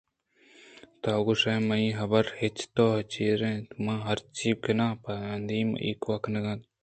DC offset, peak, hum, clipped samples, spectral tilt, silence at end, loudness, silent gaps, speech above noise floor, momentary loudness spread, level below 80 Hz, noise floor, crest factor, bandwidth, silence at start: under 0.1%; -10 dBFS; none; under 0.1%; -6 dB/octave; 0.2 s; -29 LUFS; none; 35 dB; 7 LU; -60 dBFS; -63 dBFS; 20 dB; 9 kHz; 0.75 s